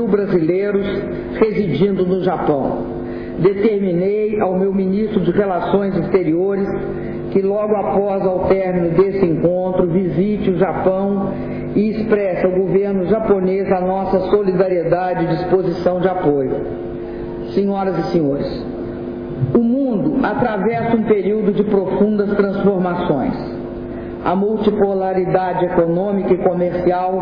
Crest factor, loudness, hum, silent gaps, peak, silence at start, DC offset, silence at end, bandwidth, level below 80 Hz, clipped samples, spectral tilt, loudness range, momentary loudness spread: 12 dB; -17 LUFS; none; none; -4 dBFS; 0 s; under 0.1%; 0 s; 5.4 kHz; -40 dBFS; under 0.1%; -10.5 dB/octave; 2 LU; 8 LU